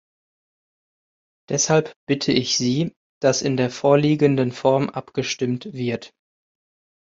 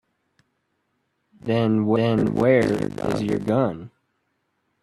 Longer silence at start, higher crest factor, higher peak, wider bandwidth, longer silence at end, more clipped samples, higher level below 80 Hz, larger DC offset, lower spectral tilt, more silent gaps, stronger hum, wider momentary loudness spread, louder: about the same, 1.5 s vs 1.45 s; about the same, 20 dB vs 18 dB; first, -2 dBFS vs -6 dBFS; second, 7.8 kHz vs 12.5 kHz; about the same, 0.95 s vs 0.95 s; neither; second, -60 dBFS vs -54 dBFS; neither; second, -4.5 dB/octave vs -8 dB/octave; first, 1.96-2.07 s, 2.96-3.21 s vs none; neither; about the same, 9 LU vs 8 LU; about the same, -21 LUFS vs -21 LUFS